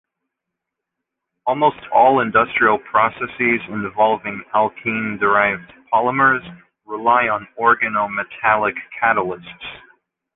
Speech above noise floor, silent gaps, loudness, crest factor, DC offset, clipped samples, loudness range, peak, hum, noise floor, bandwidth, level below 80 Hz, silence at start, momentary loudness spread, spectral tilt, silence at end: 63 dB; none; -18 LUFS; 18 dB; under 0.1%; under 0.1%; 2 LU; -2 dBFS; none; -81 dBFS; 4 kHz; -56 dBFS; 1.45 s; 10 LU; -8.5 dB/octave; 0.55 s